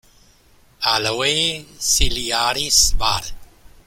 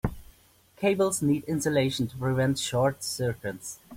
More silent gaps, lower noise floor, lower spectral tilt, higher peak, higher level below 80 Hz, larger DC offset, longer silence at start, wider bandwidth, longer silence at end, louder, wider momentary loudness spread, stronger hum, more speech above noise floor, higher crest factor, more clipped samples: neither; second, -53 dBFS vs -59 dBFS; second, -1 dB/octave vs -5 dB/octave; first, 0 dBFS vs -10 dBFS; first, -30 dBFS vs -50 dBFS; neither; first, 0.8 s vs 0.05 s; about the same, 16.5 kHz vs 16.5 kHz; first, 0.4 s vs 0 s; first, -18 LUFS vs -27 LUFS; about the same, 9 LU vs 10 LU; neither; about the same, 34 dB vs 32 dB; about the same, 20 dB vs 18 dB; neither